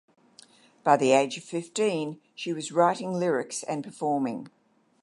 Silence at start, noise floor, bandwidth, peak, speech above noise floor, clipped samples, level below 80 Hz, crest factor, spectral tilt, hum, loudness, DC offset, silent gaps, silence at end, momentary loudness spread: 0.85 s; -56 dBFS; 11.5 kHz; -6 dBFS; 30 dB; under 0.1%; -78 dBFS; 22 dB; -4.5 dB/octave; none; -27 LUFS; under 0.1%; none; 0.55 s; 12 LU